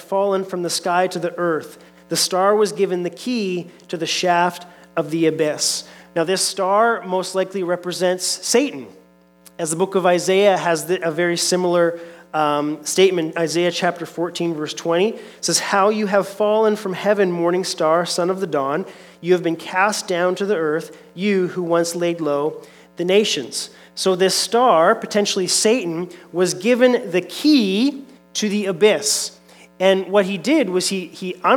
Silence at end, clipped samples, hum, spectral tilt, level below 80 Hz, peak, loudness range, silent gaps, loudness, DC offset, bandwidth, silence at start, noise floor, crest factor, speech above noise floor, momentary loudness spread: 0 s; under 0.1%; none; -3.5 dB/octave; -72 dBFS; -2 dBFS; 3 LU; none; -19 LUFS; under 0.1%; 18.5 kHz; 0 s; -51 dBFS; 18 dB; 32 dB; 10 LU